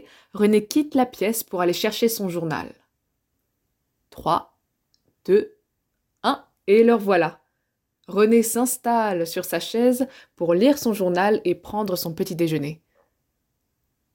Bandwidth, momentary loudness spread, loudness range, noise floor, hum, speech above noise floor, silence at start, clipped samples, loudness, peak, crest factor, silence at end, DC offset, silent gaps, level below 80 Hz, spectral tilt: 17 kHz; 11 LU; 7 LU; -77 dBFS; none; 56 dB; 0.35 s; under 0.1%; -22 LUFS; -6 dBFS; 18 dB; 1.4 s; under 0.1%; none; -62 dBFS; -5 dB/octave